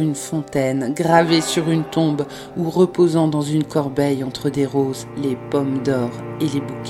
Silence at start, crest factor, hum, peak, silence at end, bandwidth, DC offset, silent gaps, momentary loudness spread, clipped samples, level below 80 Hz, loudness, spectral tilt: 0 s; 18 dB; none; 0 dBFS; 0 s; 15.5 kHz; under 0.1%; none; 9 LU; under 0.1%; -54 dBFS; -20 LUFS; -6 dB/octave